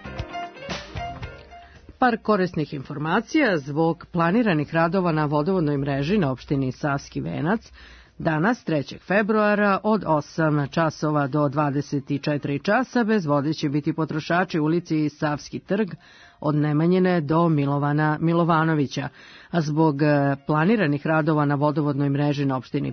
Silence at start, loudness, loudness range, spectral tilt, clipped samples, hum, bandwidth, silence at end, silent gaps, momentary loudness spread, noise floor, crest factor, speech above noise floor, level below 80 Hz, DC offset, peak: 0 s; -23 LUFS; 3 LU; -7.5 dB/octave; under 0.1%; none; 6.6 kHz; 0 s; none; 9 LU; -45 dBFS; 16 dB; 23 dB; -52 dBFS; under 0.1%; -6 dBFS